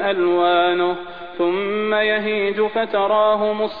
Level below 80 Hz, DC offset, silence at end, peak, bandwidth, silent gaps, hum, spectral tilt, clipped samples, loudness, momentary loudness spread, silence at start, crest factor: -56 dBFS; 0.7%; 0 s; -6 dBFS; 4.9 kHz; none; none; -7.5 dB/octave; under 0.1%; -19 LUFS; 6 LU; 0 s; 12 dB